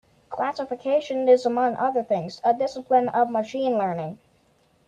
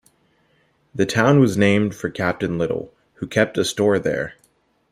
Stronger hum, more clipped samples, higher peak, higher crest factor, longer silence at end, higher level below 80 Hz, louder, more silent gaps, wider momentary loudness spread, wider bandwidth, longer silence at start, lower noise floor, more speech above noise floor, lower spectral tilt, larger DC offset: neither; neither; second, -8 dBFS vs -2 dBFS; about the same, 16 dB vs 18 dB; about the same, 0.7 s vs 0.6 s; second, -68 dBFS vs -54 dBFS; second, -23 LUFS vs -20 LUFS; neither; second, 10 LU vs 15 LU; second, 8.6 kHz vs 15 kHz; second, 0.3 s vs 0.95 s; about the same, -62 dBFS vs -62 dBFS; about the same, 40 dB vs 43 dB; about the same, -6 dB/octave vs -6 dB/octave; neither